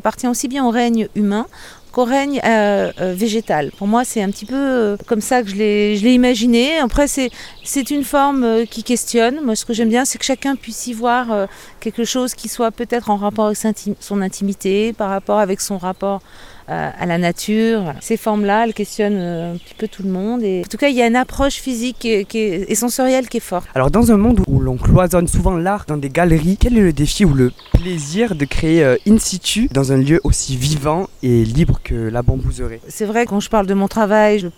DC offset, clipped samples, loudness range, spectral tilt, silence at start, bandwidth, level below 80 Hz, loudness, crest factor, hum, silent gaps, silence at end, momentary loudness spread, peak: under 0.1%; under 0.1%; 4 LU; -5 dB/octave; 0.05 s; 17.5 kHz; -28 dBFS; -17 LUFS; 16 dB; none; none; 0.05 s; 8 LU; 0 dBFS